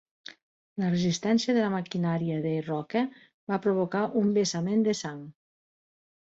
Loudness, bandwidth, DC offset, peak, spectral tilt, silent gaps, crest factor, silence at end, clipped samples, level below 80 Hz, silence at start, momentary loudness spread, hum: -28 LUFS; 8 kHz; under 0.1%; -14 dBFS; -6 dB/octave; 3.34-3.47 s; 14 dB; 1.1 s; under 0.1%; -68 dBFS; 0.75 s; 16 LU; none